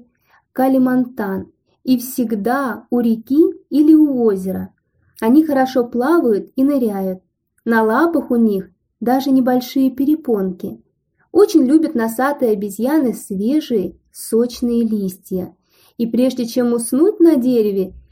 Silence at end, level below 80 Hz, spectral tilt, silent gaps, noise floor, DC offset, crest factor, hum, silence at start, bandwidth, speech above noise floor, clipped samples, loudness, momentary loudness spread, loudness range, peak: 0.15 s; -56 dBFS; -6 dB/octave; none; -57 dBFS; under 0.1%; 16 dB; none; 0.55 s; 16.5 kHz; 42 dB; under 0.1%; -16 LUFS; 12 LU; 4 LU; -2 dBFS